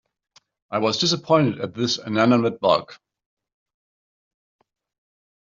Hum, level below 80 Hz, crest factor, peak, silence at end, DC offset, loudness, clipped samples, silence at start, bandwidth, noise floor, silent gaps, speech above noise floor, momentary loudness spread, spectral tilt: none; -66 dBFS; 22 dB; -4 dBFS; 2.65 s; under 0.1%; -21 LUFS; under 0.1%; 0.7 s; 7.6 kHz; under -90 dBFS; none; over 69 dB; 6 LU; -5 dB/octave